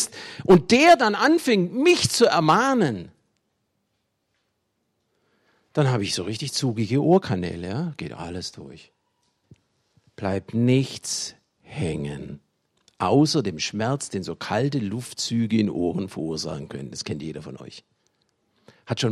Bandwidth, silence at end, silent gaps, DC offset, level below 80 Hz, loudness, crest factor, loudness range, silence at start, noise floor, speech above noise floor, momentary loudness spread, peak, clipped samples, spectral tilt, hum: 14 kHz; 0 s; none; under 0.1%; -58 dBFS; -22 LUFS; 18 dB; 11 LU; 0 s; -74 dBFS; 52 dB; 16 LU; -6 dBFS; under 0.1%; -5 dB/octave; none